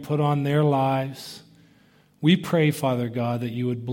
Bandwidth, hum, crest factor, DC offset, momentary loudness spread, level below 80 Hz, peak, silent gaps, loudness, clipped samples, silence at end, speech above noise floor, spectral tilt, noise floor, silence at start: 17 kHz; none; 18 dB; under 0.1%; 13 LU; -64 dBFS; -6 dBFS; none; -23 LUFS; under 0.1%; 0 s; 35 dB; -7 dB/octave; -58 dBFS; 0 s